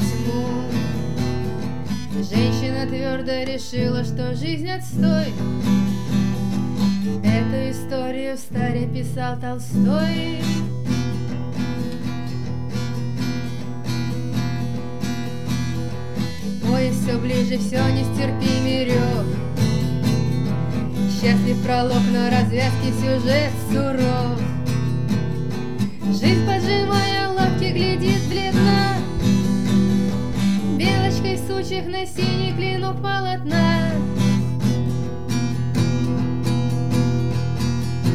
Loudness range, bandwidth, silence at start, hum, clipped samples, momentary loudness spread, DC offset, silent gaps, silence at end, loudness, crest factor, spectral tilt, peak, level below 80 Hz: 6 LU; 14.5 kHz; 0 s; none; under 0.1%; 8 LU; 3%; none; 0 s; -22 LUFS; 14 dB; -6.5 dB/octave; -6 dBFS; -42 dBFS